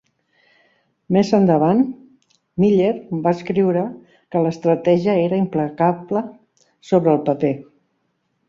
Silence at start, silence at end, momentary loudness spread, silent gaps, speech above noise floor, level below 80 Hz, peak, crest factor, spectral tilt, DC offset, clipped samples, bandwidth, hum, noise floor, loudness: 1.1 s; 0.85 s; 9 LU; none; 52 dB; -60 dBFS; -2 dBFS; 16 dB; -8.5 dB/octave; under 0.1%; under 0.1%; 7.4 kHz; none; -69 dBFS; -18 LUFS